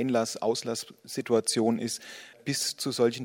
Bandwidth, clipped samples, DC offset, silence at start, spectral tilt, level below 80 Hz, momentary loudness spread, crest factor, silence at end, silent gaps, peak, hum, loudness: 17.5 kHz; under 0.1%; under 0.1%; 0 s; -3.5 dB/octave; -76 dBFS; 11 LU; 18 dB; 0 s; none; -12 dBFS; none; -29 LUFS